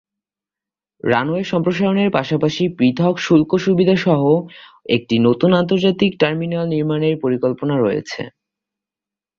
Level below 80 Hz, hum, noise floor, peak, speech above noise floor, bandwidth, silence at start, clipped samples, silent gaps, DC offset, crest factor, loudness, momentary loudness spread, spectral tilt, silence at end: -54 dBFS; none; -89 dBFS; -2 dBFS; 72 dB; 7.2 kHz; 1.05 s; under 0.1%; none; under 0.1%; 16 dB; -17 LUFS; 6 LU; -7 dB/octave; 1.1 s